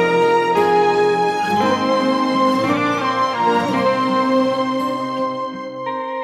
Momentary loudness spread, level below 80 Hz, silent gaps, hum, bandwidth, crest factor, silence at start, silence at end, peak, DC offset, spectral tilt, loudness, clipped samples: 8 LU; -60 dBFS; none; none; 14.5 kHz; 12 dB; 0 s; 0 s; -4 dBFS; under 0.1%; -5.5 dB/octave; -17 LUFS; under 0.1%